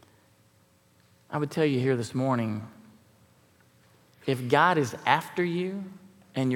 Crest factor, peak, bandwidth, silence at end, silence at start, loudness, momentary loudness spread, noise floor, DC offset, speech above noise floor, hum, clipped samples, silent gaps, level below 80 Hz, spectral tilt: 24 dB; -6 dBFS; 17.5 kHz; 0 s; 1.3 s; -27 LUFS; 15 LU; -63 dBFS; under 0.1%; 36 dB; none; under 0.1%; none; -76 dBFS; -6 dB/octave